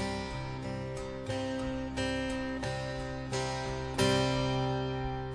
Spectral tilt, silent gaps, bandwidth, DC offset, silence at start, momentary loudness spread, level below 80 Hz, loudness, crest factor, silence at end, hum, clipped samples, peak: -5 dB/octave; none; 11 kHz; under 0.1%; 0 s; 9 LU; -46 dBFS; -34 LUFS; 18 dB; 0 s; none; under 0.1%; -16 dBFS